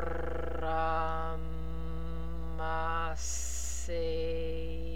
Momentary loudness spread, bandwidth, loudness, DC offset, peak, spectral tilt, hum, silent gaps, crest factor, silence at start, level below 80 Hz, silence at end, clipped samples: 8 LU; 16 kHz; -36 LUFS; 2%; -20 dBFS; -4.5 dB/octave; none; none; 16 dB; 0 s; -40 dBFS; 0 s; under 0.1%